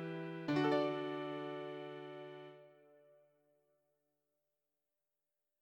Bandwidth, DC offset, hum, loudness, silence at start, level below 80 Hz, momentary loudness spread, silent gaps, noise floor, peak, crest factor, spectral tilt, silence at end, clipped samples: 8.4 kHz; under 0.1%; none; -40 LUFS; 0 s; -86 dBFS; 19 LU; none; under -90 dBFS; -22 dBFS; 20 dB; -7 dB/octave; 2.85 s; under 0.1%